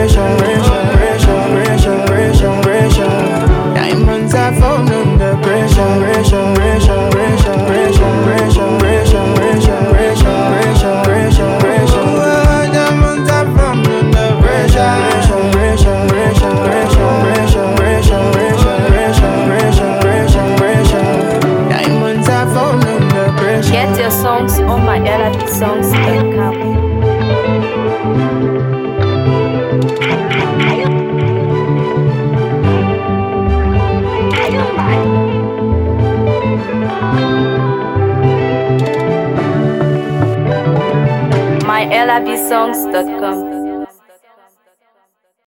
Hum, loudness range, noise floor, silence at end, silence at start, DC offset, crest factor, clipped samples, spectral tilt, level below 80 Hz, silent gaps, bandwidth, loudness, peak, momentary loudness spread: none; 3 LU; -60 dBFS; 1.6 s; 0 s; under 0.1%; 10 dB; under 0.1%; -6.5 dB/octave; -20 dBFS; none; 17.5 kHz; -12 LUFS; 0 dBFS; 4 LU